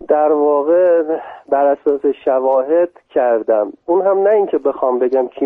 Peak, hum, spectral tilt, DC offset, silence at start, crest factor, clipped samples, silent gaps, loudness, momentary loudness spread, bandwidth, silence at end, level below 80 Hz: -2 dBFS; none; -8.5 dB/octave; under 0.1%; 0 s; 14 dB; under 0.1%; none; -15 LUFS; 5 LU; 3.7 kHz; 0 s; -62 dBFS